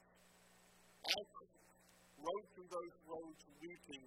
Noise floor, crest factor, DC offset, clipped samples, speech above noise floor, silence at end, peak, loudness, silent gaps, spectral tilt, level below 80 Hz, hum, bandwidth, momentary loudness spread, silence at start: -70 dBFS; 32 dB; under 0.1%; under 0.1%; 17 dB; 0 s; -20 dBFS; -47 LUFS; none; -2 dB/octave; -82 dBFS; 60 Hz at -75 dBFS; 16 kHz; 27 LU; 0 s